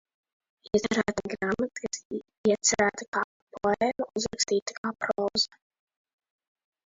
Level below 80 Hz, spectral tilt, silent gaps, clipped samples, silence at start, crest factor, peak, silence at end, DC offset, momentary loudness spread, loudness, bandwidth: -60 dBFS; -2.5 dB/octave; 2.05-2.10 s, 2.38-2.44 s, 3.08-3.13 s, 3.24-3.47 s, 4.62-4.66 s, 4.78-4.84 s; under 0.1%; 0.75 s; 20 dB; -10 dBFS; 1.4 s; under 0.1%; 10 LU; -28 LUFS; 7.8 kHz